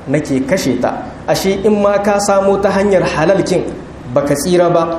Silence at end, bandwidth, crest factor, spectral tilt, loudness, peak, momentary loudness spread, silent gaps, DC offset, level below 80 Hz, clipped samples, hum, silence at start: 0 s; 14.5 kHz; 14 dB; -5.5 dB/octave; -13 LUFS; 0 dBFS; 6 LU; none; under 0.1%; -38 dBFS; under 0.1%; none; 0 s